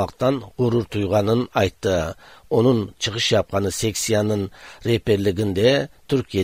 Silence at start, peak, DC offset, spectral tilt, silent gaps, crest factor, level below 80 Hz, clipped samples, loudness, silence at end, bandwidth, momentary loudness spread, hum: 0 s; -4 dBFS; 0.2%; -5 dB/octave; none; 16 dB; -46 dBFS; under 0.1%; -21 LUFS; 0 s; 16 kHz; 6 LU; none